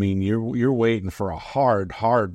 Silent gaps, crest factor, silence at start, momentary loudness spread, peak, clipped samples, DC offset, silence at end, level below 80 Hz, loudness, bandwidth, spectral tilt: none; 14 dB; 0 s; 7 LU; -8 dBFS; under 0.1%; under 0.1%; 0 s; -48 dBFS; -22 LUFS; 14 kHz; -8 dB/octave